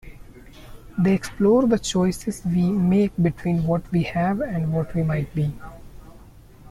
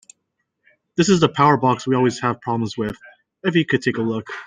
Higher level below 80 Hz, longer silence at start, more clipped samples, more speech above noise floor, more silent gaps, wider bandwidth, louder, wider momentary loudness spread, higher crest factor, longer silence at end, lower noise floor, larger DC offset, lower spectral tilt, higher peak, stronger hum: first, -44 dBFS vs -56 dBFS; second, 0.05 s vs 0.95 s; neither; second, 25 dB vs 56 dB; neither; first, 13 kHz vs 9.8 kHz; second, -22 LUFS vs -19 LUFS; second, 8 LU vs 11 LU; about the same, 16 dB vs 18 dB; about the same, 0 s vs 0 s; second, -46 dBFS vs -74 dBFS; neither; first, -7 dB/octave vs -5.5 dB/octave; second, -8 dBFS vs -2 dBFS; neither